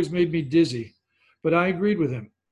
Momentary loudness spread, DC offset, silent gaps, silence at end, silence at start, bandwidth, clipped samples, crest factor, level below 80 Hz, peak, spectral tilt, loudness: 13 LU; under 0.1%; none; 0.25 s; 0 s; 10.5 kHz; under 0.1%; 18 dB; -58 dBFS; -6 dBFS; -7 dB/octave; -23 LUFS